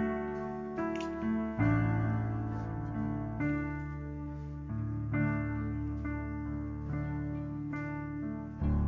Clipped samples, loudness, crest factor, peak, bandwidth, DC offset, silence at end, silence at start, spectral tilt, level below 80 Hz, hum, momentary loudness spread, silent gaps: under 0.1%; -35 LUFS; 16 dB; -18 dBFS; 7.4 kHz; under 0.1%; 0 s; 0 s; -9.5 dB/octave; -44 dBFS; none; 8 LU; none